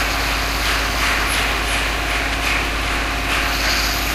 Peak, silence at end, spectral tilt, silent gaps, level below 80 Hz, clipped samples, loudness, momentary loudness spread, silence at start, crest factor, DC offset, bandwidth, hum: -6 dBFS; 0 s; -2.5 dB/octave; none; -26 dBFS; under 0.1%; -18 LUFS; 3 LU; 0 s; 14 dB; under 0.1%; 16 kHz; none